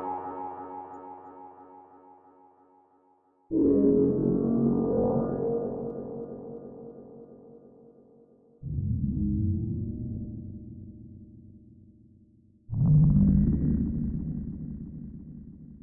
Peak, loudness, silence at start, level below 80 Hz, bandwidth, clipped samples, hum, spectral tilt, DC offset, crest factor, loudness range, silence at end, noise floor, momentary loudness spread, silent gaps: -12 dBFS; -27 LUFS; 0 s; -42 dBFS; 2 kHz; under 0.1%; none; -15.5 dB/octave; under 0.1%; 18 dB; 13 LU; 0 s; -65 dBFS; 24 LU; none